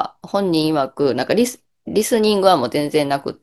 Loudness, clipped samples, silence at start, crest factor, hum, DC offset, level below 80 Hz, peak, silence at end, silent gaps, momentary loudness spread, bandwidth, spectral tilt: -18 LUFS; under 0.1%; 0 s; 18 dB; none; under 0.1%; -56 dBFS; 0 dBFS; 0.1 s; none; 7 LU; 13 kHz; -4.5 dB/octave